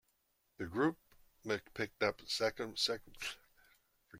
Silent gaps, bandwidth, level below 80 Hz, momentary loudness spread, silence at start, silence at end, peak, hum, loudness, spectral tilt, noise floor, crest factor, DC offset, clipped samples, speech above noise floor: none; 16.5 kHz; -70 dBFS; 13 LU; 0.6 s; 0 s; -18 dBFS; none; -38 LUFS; -3.5 dB/octave; -79 dBFS; 22 dB; under 0.1%; under 0.1%; 41 dB